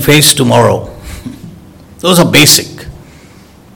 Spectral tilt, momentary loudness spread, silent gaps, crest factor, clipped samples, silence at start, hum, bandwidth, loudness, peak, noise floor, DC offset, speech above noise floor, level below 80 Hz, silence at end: -3.5 dB/octave; 22 LU; none; 10 dB; 3%; 0 s; none; over 20 kHz; -7 LUFS; 0 dBFS; -38 dBFS; under 0.1%; 31 dB; -36 dBFS; 0.85 s